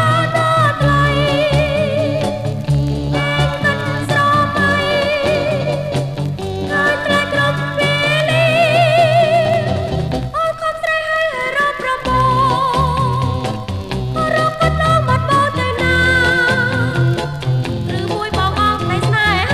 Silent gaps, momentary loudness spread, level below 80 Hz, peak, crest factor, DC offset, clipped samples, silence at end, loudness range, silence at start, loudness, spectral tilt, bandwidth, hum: none; 8 LU; -32 dBFS; -2 dBFS; 14 dB; under 0.1%; under 0.1%; 0 s; 3 LU; 0 s; -15 LUFS; -5.5 dB/octave; 14.5 kHz; none